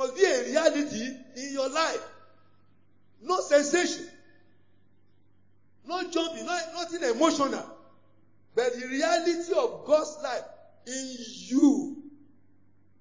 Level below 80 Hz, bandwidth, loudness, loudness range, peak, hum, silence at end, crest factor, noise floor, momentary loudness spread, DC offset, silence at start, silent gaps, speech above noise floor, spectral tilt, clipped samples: -76 dBFS; 7.6 kHz; -28 LUFS; 3 LU; -8 dBFS; none; 0.9 s; 20 dB; -67 dBFS; 15 LU; 0.2%; 0 s; none; 41 dB; -2.5 dB/octave; under 0.1%